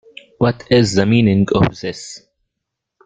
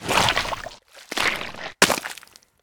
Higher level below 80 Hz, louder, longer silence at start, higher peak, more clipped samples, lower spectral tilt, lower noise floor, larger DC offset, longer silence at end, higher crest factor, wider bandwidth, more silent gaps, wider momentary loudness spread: about the same, -44 dBFS vs -46 dBFS; first, -15 LUFS vs -22 LUFS; first, 0.4 s vs 0 s; about the same, 0 dBFS vs -2 dBFS; neither; first, -6 dB/octave vs -2 dB/octave; first, -79 dBFS vs -47 dBFS; neither; first, 0.9 s vs 0.45 s; second, 16 dB vs 24 dB; second, 9.4 kHz vs over 20 kHz; neither; about the same, 14 LU vs 16 LU